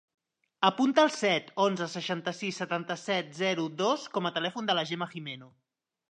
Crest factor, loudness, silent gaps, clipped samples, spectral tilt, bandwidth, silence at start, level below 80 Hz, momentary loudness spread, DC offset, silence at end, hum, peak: 22 dB; -29 LUFS; none; under 0.1%; -4.5 dB/octave; 10 kHz; 0.6 s; -84 dBFS; 10 LU; under 0.1%; 0.65 s; none; -8 dBFS